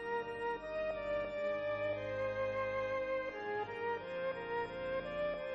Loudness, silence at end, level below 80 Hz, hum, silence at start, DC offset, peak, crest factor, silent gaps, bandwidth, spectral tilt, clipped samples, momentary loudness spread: -39 LUFS; 0 s; -62 dBFS; none; 0 s; under 0.1%; -28 dBFS; 10 dB; none; 7.8 kHz; -6 dB/octave; under 0.1%; 3 LU